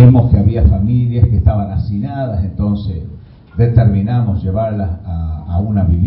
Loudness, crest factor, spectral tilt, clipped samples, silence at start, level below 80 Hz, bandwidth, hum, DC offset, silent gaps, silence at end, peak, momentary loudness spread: -15 LUFS; 12 dB; -14.5 dB/octave; 0.1%; 0 s; -20 dBFS; 4.7 kHz; none; under 0.1%; none; 0 s; 0 dBFS; 11 LU